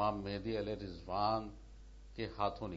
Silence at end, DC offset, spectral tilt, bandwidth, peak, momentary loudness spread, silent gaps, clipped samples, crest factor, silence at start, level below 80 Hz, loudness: 0 s; under 0.1%; -5 dB/octave; 7.6 kHz; -22 dBFS; 20 LU; none; under 0.1%; 18 dB; 0 s; -54 dBFS; -39 LUFS